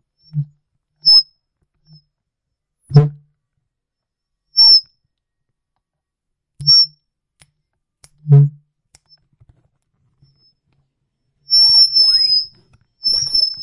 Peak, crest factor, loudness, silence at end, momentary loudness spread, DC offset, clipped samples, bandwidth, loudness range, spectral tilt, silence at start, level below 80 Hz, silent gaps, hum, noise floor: 0 dBFS; 18 dB; -11 LUFS; 0 s; 19 LU; under 0.1%; under 0.1%; 11.5 kHz; 8 LU; -5 dB/octave; 0.35 s; -54 dBFS; none; none; -81 dBFS